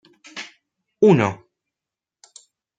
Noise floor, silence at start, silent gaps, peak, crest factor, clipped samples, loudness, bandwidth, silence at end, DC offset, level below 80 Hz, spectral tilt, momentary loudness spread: -88 dBFS; 0.35 s; none; -4 dBFS; 20 dB; under 0.1%; -17 LUFS; 9 kHz; 1.45 s; under 0.1%; -68 dBFS; -7 dB/octave; 24 LU